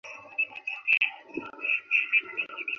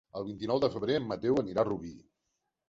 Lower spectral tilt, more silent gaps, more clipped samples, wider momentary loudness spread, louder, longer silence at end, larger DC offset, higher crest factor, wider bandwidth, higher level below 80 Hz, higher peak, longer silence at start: second, -2 dB/octave vs -7 dB/octave; neither; neither; about the same, 12 LU vs 10 LU; first, -26 LUFS vs -32 LUFS; second, 0 s vs 0.7 s; neither; about the same, 20 dB vs 18 dB; second, 6.8 kHz vs 7.6 kHz; second, -76 dBFS vs -62 dBFS; first, -10 dBFS vs -14 dBFS; about the same, 0.05 s vs 0.15 s